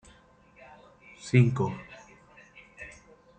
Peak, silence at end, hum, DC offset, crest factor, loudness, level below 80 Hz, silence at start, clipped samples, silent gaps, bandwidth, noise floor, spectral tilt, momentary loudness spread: -10 dBFS; 0.5 s; none; under 0.1%; 22 dB; -26 LUFS; -62 dBFS; 1.25 s; under 0.1%; none; 8.8 kHz; -58 dBFS; -7.5 dB/octave; 27 LU